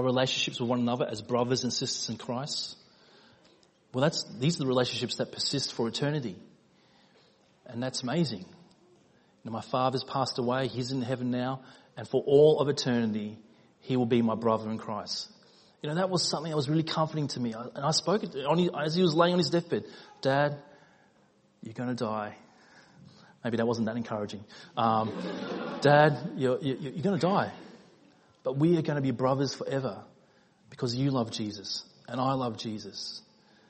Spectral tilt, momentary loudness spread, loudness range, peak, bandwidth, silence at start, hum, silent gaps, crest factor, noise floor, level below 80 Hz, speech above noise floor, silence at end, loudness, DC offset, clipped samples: -5.5 dB/octave; 13 LU; 7 LU; -8 dBFS; 8.4 kHz; 0 s; none; none; 22 dB; -65 dBFS; -70 dBFS; 36 dB; 0.5 s; -29 LUFS; under 0.1%; under 0.1%